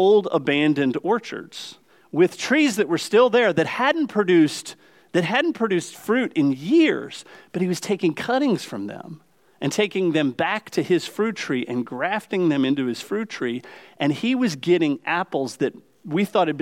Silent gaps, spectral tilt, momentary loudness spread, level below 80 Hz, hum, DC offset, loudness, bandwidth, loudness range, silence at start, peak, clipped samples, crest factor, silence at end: none; -5 dB/octave; 12 LU; -74 dBFS; none; under 0.1%; -22 LUFS; 16 kHz; 4 LU; 0 s; -6 dBFS; under 0.1%; 16 dB; 0 s